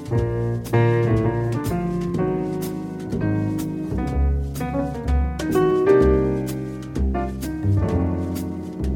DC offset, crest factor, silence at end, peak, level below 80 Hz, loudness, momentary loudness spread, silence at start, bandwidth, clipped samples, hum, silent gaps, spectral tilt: under 0.1%; 18 dB; 0 s; -4 dBFS; -30 dBFS; -22 LUFS; 9 LU; 0 s; 17.5 kHz; under 0.1%; none; none; -8 dB/octave